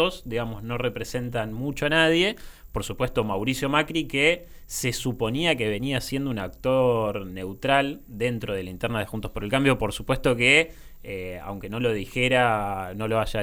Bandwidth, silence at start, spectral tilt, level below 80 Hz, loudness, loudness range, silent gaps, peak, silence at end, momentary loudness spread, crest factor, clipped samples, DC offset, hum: 18.5 kHz; 0 s; -4.5 dB/octave; -42 dBFS; -25 LUFS; 3 LU; none; -6 dBFS; 0 s; 13 LU; 20 dB; under 0.1%; under 0.1%; none